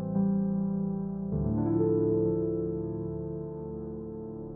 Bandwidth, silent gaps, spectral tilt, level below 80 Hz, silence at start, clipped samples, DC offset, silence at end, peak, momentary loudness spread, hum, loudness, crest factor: 1.9 kHz; none; -15.5 dB/octave; -50 dBFS; 0 s; under 0.1%; under 0.1%; 0 s; -16 dBFS; 12 LU; none; -31 LUFS; 14 dB